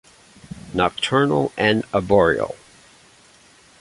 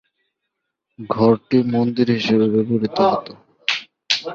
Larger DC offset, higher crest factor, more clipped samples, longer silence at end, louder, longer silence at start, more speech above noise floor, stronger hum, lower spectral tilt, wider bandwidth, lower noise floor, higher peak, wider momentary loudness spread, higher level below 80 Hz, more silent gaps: neither; about the same, 20 dB vs 18 dB; neither; first, 1.25 s vs 0 s; about the same, -19 LUFS vs -19 LUFS; second, 0.55 s vs 1 s; second, 33 dB vs 61 dB; neither; about the same, -5.5 dB/octave vs -6 dB/octave; first, 11.5 kHz vs 7.4 kHz; second, -51 dBFS vs -78 dBFS; about the same, -2 dBFS vs -2 dBFS; first, 19 LU vs 9 LU; first, -48 dBFS vs -58 dBFS; neither